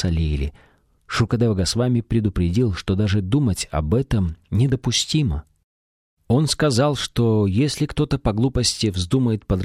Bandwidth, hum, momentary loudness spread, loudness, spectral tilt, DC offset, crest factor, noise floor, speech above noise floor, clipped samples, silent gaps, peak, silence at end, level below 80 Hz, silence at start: 14.5 kHz; none; 5 LU; -21 LUFS; -5.5 dB/octave; under 0.1%; 14 dB; under -90 dBFS; over 70 dB; under 0.1%; 5.64-6.17 s; -6 dBFS; 0 s; -34 dBFS; 0 s